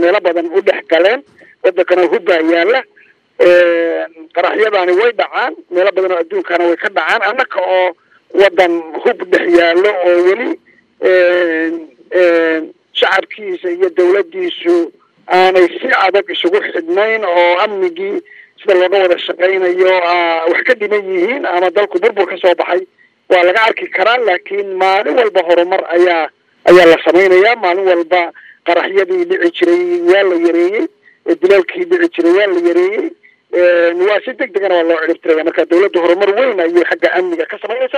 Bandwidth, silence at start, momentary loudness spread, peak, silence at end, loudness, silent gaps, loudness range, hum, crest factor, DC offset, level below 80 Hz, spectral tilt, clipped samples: 9.4 kHz; 0 s; 8 LU; 0 dBFS; 0 s; -12 LUFS; none; 3 LU; none; 12 dB; under 0.1%; -60 dBFS; -4.5 dB/octave; 0.2%